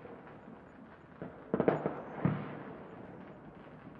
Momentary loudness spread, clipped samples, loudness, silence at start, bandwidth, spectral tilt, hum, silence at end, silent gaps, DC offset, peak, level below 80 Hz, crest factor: 21 LU; under 0.1%; -37 LUFS; 0 s; 4.9 kHz; -10.5 dB/octave; none; 0 s; none; under 0.1%; -12 dBFS; -68 dBFS; 28 dB